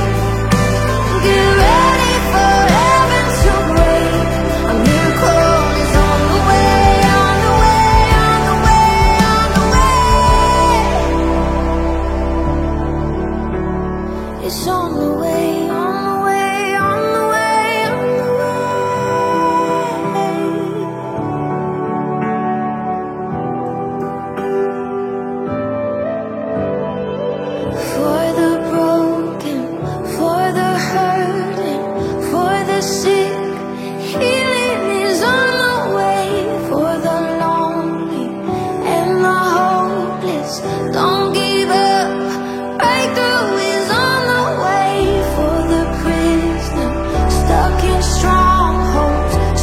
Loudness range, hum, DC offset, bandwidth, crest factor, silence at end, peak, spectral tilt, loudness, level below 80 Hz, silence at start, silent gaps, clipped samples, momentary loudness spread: 8 LU; none; under 0.1%; 16.5 kHz; 14 dB; 0 s; 0 dBFS; -5 dB/octave; -15 LUFS; -22 dBFS; 0 s; none; under 0.1%; 10 LU